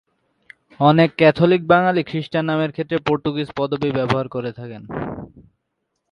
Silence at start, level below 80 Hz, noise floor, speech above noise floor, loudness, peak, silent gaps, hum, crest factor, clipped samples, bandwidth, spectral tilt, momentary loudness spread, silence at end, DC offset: 0.8 s; -52 dBFS; -75 dBFS; 56 dB; -19 LUFS; 0 dBFS; none; none; 20 dB; under 0.1%; 9.6 kHz; -8 dB/octave; 15 LU; 0.85 s; under 0.1%